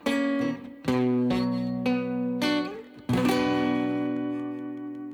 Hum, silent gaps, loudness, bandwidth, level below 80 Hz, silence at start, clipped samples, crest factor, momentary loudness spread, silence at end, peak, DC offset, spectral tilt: none; none; -27 LUFS; 18 kHz; -58 dBFS; 0 s; under 0.1%; 14 dB; 10 LU; 0 s; -12 dBFS; under 0.1%; -6 dB/octave